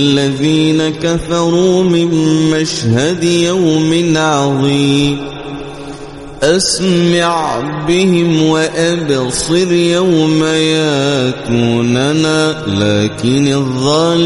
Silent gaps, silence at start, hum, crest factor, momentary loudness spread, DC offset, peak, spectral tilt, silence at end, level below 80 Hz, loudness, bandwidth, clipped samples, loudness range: none; 0 s; none; 12 dB; 5 LU; under 0.1%; 0 dBFS; -5 dB/octave; 0 s; -40 dBFS; -12 LUFS; 11.5 kHz; under 0.1%; 2 LU